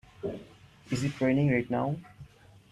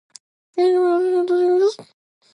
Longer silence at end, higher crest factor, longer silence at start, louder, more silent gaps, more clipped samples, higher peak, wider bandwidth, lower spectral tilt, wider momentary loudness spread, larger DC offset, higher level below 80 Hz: about the same, 0.45 s vs 0.5 s; first, 18 dB vs 10 dB; second, 0.2 s vs 0.55 s; second, -30 LUFS vs -18 LUFS; neither; neither; second, -14 dBFS vs -10 dBFS; first, 12 kHz vs 10.5 kHz; first, -7 dB/octave vs -4.5 dB/octave; first, 13 LU vs 9 LU; neither; first, -60 dBFS vs -82 dBFS